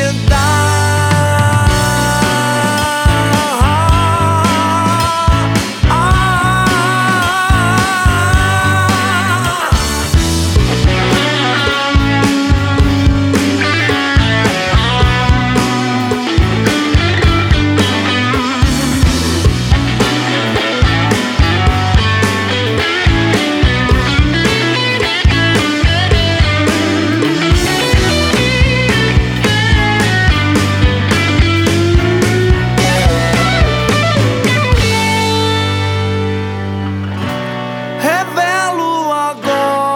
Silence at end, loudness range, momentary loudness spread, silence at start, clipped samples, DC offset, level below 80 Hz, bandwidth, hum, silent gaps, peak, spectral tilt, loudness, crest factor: 0 s; 1 LU; 3 LU; 0 s; under 0.1%; under 0.1%; -20 dBFS; 17 kHz; none; none; 0 dBFS; -5 dB/octave; -12 LUFS; 12 dB